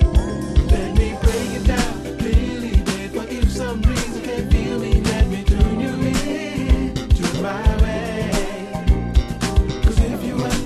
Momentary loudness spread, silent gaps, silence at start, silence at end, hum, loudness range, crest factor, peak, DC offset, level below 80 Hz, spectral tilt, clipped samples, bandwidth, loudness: 5 LU; none; 0 s; 0 s; none; 1 LU; 16 dB; -2 dBFS; under 0.1%; -20 dBFS; -6 dB/octave; under 0.1%; 13.5 kHz; -20 LUFS